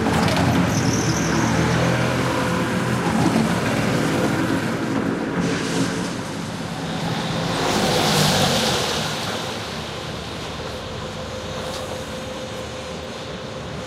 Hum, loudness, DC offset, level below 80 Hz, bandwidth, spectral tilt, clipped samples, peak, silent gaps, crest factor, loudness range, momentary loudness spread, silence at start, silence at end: none; -22 LUFS; under 0.1%; -44 dBFS; 16 kHz; -4.5 dB/octave; under 0.1%; -6 dBFS; none; 16 dB; 9 LU; 12 LU; 0 s; 0 s